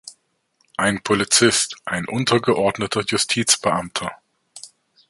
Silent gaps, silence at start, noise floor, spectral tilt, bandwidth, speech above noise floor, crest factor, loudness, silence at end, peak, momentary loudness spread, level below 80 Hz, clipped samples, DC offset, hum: none; 0.05 s; -66 dBFS; -2.5 dB/octave; 12 kHz; 46 dB; 20 dB; -19 LUFS; 0.45 s; 0 dBFS; 17 LU; -54 dBFS; under 0.1%; under 0.1%; none